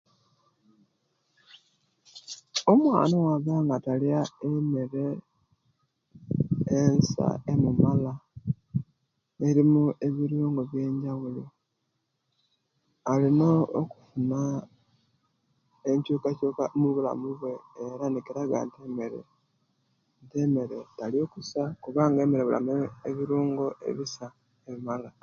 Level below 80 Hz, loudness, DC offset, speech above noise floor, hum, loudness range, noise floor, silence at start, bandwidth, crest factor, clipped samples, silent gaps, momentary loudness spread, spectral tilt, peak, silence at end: -60 dBFS; -27 LUFS; under 0.1%; 52 dB; none; 6 LU; -78 dBFS; 2.15 s; 7.4 kHz; 22 dB; under 0.1%; none; 14 LU; -7.5 dB/octave; -6 dBFS; 0.15 s